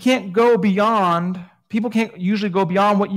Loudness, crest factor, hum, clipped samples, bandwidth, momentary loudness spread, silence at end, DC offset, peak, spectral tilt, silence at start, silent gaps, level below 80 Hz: -18 LUFS; 14 dB; none; under 0.1%; 15 kHz; 9 LU; 0 s; under 0.1%; -4 dBFS; -6.5 dB/octave; 0 s; none; -66 dBFS